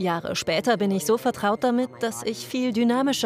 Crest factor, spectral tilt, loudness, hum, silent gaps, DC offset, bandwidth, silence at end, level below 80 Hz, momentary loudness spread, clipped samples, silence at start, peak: 14 dB; -4.5 dB/octave; -24 LUFS; none; none; under 0.1%; 16 kHz; 0 s; -62 dBFS; 6 LU; under 0.1%; 0 s; -10 dBFS